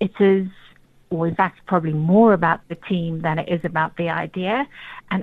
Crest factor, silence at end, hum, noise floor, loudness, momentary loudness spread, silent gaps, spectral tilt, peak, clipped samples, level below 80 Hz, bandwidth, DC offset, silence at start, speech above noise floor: 18 dB; 0 s; none; -51 dBFS; -21 LUFS; 11 LU; none; -9.5 dB/octave; -2 dBFS; under 0.1%; -54 dBFS; 4.5 kHz; under 0.1%; 0 s; 31 dB